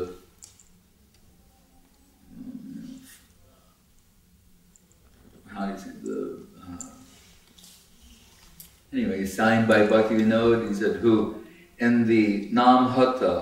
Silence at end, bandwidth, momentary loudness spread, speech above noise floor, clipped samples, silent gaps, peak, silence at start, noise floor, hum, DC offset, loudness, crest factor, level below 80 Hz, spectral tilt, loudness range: 0 s; 16 kHz; 23 LU; 39 dB; under 0.1%; none; -4 dBFS; 0 s; -59 dBFS; none; under 0.1%; -22 LUFS; 22 dB; -56 dBFS; -6 dB/octave; 25 LU